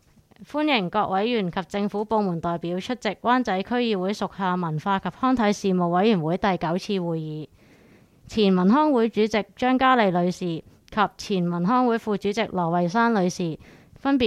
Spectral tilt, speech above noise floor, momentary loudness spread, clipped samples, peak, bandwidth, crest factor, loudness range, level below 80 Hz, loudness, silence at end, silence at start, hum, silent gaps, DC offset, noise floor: -6.5 dB/octave; 31 dB; 10 LU; under 0.1%; -6 dBFS; 12.5 kHz; 16 dB; 3 LU; -56 dBFS; -23 LUFS; 0 s; 0.4 s; none; none; under 0.1%; -54 dBFS